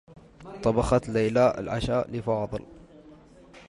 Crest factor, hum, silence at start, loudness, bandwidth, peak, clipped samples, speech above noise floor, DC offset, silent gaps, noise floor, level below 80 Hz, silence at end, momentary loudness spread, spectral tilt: 18 dB; none; 0.1 s; -26 LUFS; 11.5 kHz; -10 dBFS; under 0.1%; 26 dB; under 0.1%; none; -51 dBFS; -44 dBFS; 0.1 s; 11 LU; -7 dB/octave